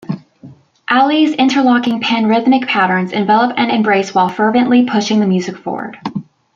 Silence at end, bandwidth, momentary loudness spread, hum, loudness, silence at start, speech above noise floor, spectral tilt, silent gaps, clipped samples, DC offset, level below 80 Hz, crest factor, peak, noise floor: 0.35 s; 7.6 kHz; 13 LU; none; -13 LUFS; 0.1 s; 27 dB; -5.5 dB/octave; none; under 0.1%; under 0.1%; -62 dBFS; 12 dB; -2 dBFS; -40 dBFS